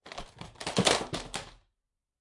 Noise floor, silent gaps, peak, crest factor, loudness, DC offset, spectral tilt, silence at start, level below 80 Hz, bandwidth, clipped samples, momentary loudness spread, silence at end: -85 dBFS; none; -8 dBFS; 26 dB; -30 LUFS; under 0.1%; -3 dB/octave; 0.05 s; -54 dBFS; 11.5 kHz; under 0.1%; 21 LU; 0.65 s